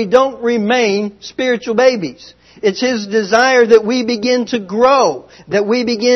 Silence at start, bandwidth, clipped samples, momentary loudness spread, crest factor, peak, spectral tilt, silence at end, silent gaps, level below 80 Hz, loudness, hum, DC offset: 0 s; 6.4 kHz; 0.2%; 9 LU; 14 dB; 0 dBFS; -4 dB/octave; 0 s; none; -56 dBFS; -14 LUFS; none; under 0.1%